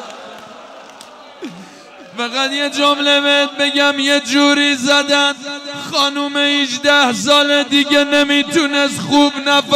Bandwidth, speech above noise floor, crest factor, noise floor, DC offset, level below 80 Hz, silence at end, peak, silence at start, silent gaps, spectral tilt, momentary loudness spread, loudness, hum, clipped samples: 15.5 kHz; 23 dB; 14 dB; -37 dBFS; under 0.1%; -60 dBFS; 0 s; -2 dBFS; 0 s; none; -2 dB/octave; 14 LU; -13 LUFS; none; under 0.1%